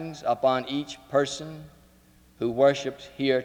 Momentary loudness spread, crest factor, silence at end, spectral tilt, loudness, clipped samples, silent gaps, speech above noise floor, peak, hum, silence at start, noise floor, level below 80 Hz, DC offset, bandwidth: 14 LU; 18 dB; 0 s; -5 dB/octave; -26 LUFS; under 0.1%; none; 31 dB; -8 dBFS; none; 0 s; -57 dBFS; -62 dBFS; under 0.1%; 14.5 kHz